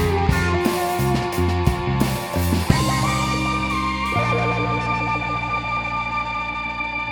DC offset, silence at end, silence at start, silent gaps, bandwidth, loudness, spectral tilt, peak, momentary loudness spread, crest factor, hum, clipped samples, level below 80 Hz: under 0.1%; 0 s; 0 s; none; over 20 kHz; -21 LUFS; -5.5 dB/octave; -2 dBFS; 4 LU; 20 dB; none; under 0.1%; -32 dBFS